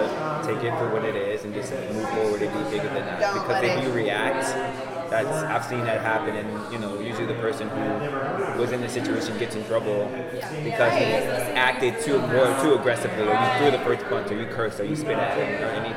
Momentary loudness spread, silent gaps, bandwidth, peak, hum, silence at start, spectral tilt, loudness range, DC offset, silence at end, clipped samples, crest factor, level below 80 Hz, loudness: 9 LU; none; 16.5 kHz; -6 dBFS; none; 0 s; -5 dB/octave; 5 LU; under 0.1%; 0 s; under 0.1%; 20 dB; -58 dBFS; -25 LUFS